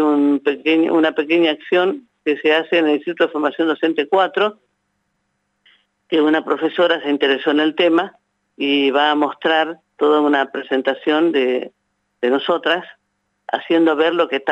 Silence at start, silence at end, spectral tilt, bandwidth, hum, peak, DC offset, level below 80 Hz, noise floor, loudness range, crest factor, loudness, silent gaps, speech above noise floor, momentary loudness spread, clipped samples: 0 s; 0 s; -5.5 dB/octave; 8 kHz; 50 Hz at -70 dBFS; -2 dBFS; under 0.1%; -82 dBFS; -70 dBFS; 3 LU; 14 dB; -17 LUFS; none; 53 dB; 6 LU; under 0.1%